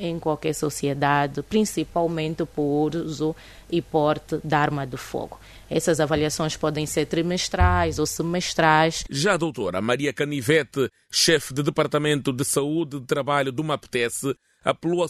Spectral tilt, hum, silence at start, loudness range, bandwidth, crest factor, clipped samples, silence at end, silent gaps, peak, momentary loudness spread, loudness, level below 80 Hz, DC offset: -4.5 dB/octave; none; 0 s; 3 LU; 13.5 kHz; 20 dB; under 0.1%; 0 s; none; -4 dBFS; 7 LU; -23 LUFS; -44 dBFS; under 0.1%